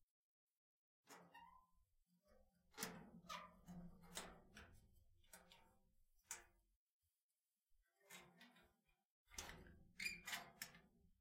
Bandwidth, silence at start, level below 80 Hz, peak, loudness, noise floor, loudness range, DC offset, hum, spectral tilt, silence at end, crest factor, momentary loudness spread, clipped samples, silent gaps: 16 kHz; 0 s; -76 dBFS; -32 dBFS; -56 LUFS; under -90 dBFS; 9 LU; under 0.1%; none; -2 dB/octave; 0.05 s; 28 dB; 17 LU; under 0.1%; 0.03-0.48 s, 0.57-1.03 s, 6.76-7.01 s, 7.22-7.29 s, 9.05-9.26 s